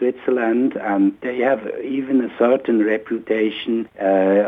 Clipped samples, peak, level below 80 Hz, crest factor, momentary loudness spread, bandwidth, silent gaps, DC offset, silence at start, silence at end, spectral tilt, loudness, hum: under 0.1%; -4 dBFS; -66 dBFS; 14 dB; 6 LU; 3.9 kHz; none; under 0.1%; 0 s; 0 s; -8.5 dB/octave; -19 LUFS; none